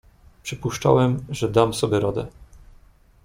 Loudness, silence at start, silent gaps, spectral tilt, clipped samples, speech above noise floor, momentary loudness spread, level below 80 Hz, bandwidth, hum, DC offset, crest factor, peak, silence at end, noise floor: -22 LUFS; 0.45 s; none; -6 dB/octave; under 0.1%; 31 dB; 15 LU; -48 dBFS; 16 kHz; none; under 0.1%; 22 dB; -2 dBFS; 0.7 s; -52 dBFS